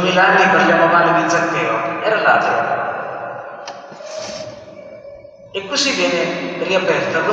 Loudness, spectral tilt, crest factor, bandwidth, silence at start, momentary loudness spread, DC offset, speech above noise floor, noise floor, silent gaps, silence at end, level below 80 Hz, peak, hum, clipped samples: -15 LUFS; -3.5 dB/octave; 16 dB; 9.2 kHz; 0 s; 21 LU; under 0.1%; 23 dB; -38 dBFS; none; 0 s; -62 dBFS; -2 dBFS; none; under 0.1%